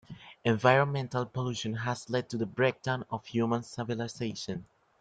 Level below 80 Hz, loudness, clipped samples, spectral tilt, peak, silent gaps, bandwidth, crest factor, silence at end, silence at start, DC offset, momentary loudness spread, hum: -66 dBFS; -31 LUFS; under 0.1%; -6 dB/octave; -8 dBFS; none; 9.2 kHz; 22 dB; 0.4 s; 0.1 s; under 0.1%; 11 LU; none